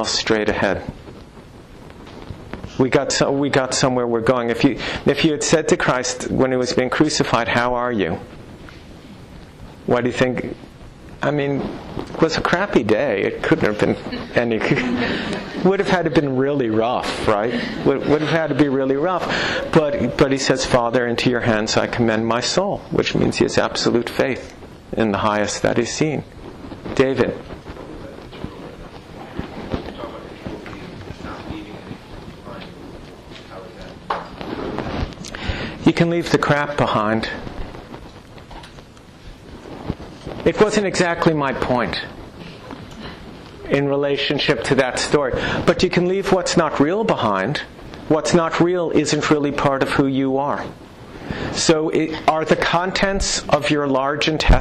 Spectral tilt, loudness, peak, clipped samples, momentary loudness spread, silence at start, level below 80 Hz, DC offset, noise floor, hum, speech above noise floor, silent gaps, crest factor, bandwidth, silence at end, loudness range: -5 dB/octave; -19 LUFS; -4 dBFS; under 0.1%; 19 LU; 0 s; -36 dBFS; under 0.1%; -41 dBFS; none; 23 dB; none; 16 dB; 12.5 kHz; 0 s; 12 LU